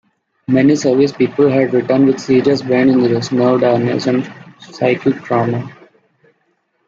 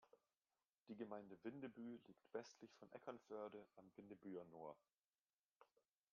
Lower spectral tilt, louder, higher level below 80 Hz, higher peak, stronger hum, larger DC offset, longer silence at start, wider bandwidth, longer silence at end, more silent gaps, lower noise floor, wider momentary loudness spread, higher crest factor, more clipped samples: first, -7 dB/octave vs -5.5 dB/octave; first, -14 LUFS vs -58 LUFS; first, -56 dBFS vs under -90 dBFS; first, -2 dBFS vs -38 dBFS; neither; neither; first, 0.5 s vs 0 s; first, 7.6 kHz vs 6.8 kHz; first, 1.15 s vs 0.5 s; second, none vs 0.69-0.73 s, 4.98-5.11 s, 5.22-5.26 s, 5.33-5.49 s, 5.56-5.60 s; second, -63 dBFS vs under -90 dBFS; about the same, 7 LU vs 8 LU; second, 12 dB vs 22 dB; neither